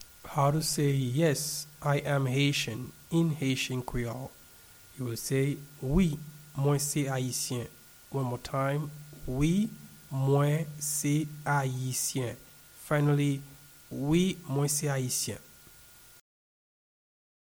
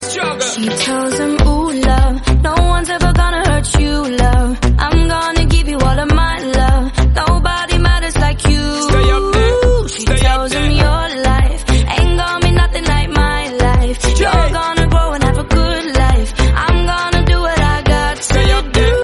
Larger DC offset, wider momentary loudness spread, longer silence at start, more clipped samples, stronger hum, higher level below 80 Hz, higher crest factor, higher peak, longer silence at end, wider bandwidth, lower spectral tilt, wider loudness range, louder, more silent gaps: neither; first, 13 LU vs 3 LU; about the same, 0 s vs 0 s; neither; neither; second, -50 dBFS vs -14 dBFS; first, 18 dB vs 12 dB; second, -14 dBFS vs 0 dBFS; first, 2.05 s vs 0 s; first, over 20 kHz vs 11.5 kHz; about the same, -5 dB/octave vs -5 dB/octave; about the same, 3 LU vs 1 LU; second, -30 LUFS vs -14 LUFS; neither